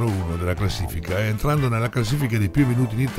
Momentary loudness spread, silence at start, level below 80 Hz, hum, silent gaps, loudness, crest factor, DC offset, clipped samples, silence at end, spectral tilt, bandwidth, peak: 5 LU; 0 s; -36 dBFS; none; none; -22 LUFS; 16 dB; under 0.1%; under 0.1%; 0 s; -6.5 dB/octave; 16 kHz; -6 dBFS